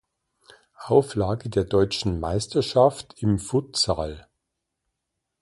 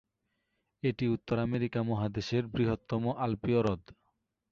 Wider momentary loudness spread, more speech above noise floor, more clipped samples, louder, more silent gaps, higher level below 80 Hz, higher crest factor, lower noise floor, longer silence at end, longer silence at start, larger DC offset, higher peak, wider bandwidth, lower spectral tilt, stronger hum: first, 9 LU vs 4 LU; first, 59 dB vs 50 dB; neither; first, -23 LUFS vs -32 LUFS; neither; first, -44 dBFS vs -56 dBFS; about the same, 20 dB vs 16 dB; about the same, -81 dBFS vs -81 dBFS; first, 1.2 s vs 0.6 s; about the same, 0.8 s vs 0.85 s; neither; first, -4 dBFS vs -16 dBFS; first, 11.5 kHz vs 7.2 kHz; second, -5.5 dB/octave vs -8 dB/octave; neither